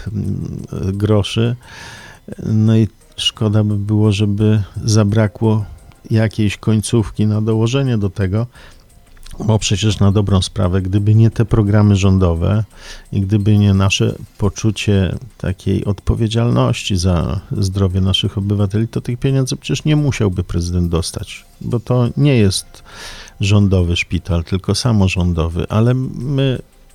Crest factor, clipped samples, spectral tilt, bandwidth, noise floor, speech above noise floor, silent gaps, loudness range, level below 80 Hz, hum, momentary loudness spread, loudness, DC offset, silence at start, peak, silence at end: 14 dB; under 0.1%; -6 dB/octave; 12.5 kHz; -40 dBFS; 25 dB; none; 3 LU; -34 dBFS; none; 11 LU; -16 LUFS; under 0.1%; 0 s; 0 dBFS; 0.3 s